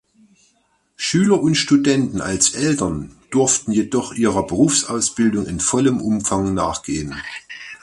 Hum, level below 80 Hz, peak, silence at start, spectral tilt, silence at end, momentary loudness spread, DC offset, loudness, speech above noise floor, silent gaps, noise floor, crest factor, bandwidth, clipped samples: none; -44 dBFS; -2 dBFS; 1 s; -4 dB/octave; 0.05 s; 10 LU; under 0.1%; -18 LUFS; 45 dB; none; -63 dBFS; 18 dB; 11.5 kHz; under 0.1%